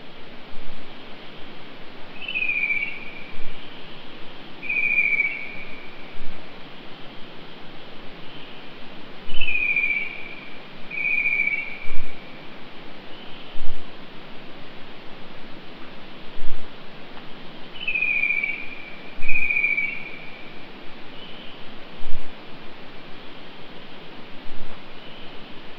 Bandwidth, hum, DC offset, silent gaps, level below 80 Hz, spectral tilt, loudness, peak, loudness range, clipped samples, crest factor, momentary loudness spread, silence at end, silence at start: 5.2 kHz; none; 2%; none; -36 dBFS; -5.5 dB/octave; -23 LUFS; -2 dBFS; 17 LU; under 0.1%; 18 dB; 21 LU; 0 s; 0 s